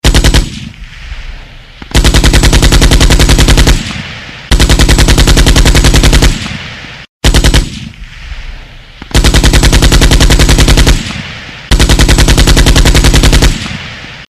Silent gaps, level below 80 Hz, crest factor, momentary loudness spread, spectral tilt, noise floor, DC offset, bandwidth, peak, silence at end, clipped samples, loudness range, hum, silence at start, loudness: 7.09-7.20 s; -8 dBFS; 6 dB; 20 LU; -4 dB/octave; -29 dBFS; 0.4%; 15.5 kHz; 0 dBFS; 0.05 s; 0.4%; 4 LU; none; 0.05 s; -7 LUFS